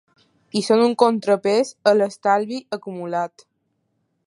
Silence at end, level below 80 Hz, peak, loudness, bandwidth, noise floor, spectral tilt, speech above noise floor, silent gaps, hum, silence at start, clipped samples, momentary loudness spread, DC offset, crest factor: 1 s; -74 dBFS; 0 dBFS; -20 LUFS; 11.5 kHz; -71 dBFS; -5 dB/octave; 52 dB; none; none; 0.55 s; under 0.1%; 12 LU; under 0.1%; 20 dB